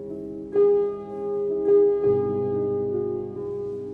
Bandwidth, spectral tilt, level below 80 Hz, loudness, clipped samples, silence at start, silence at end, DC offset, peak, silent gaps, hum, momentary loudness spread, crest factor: 2.6 kHz; -10.5 dB/octave; -58 dBFS; -24 LUFS; under 0.1%; 0 s; 0 s; under 0.1%; -12 dBFS; none; none; 12 LU; 12 dB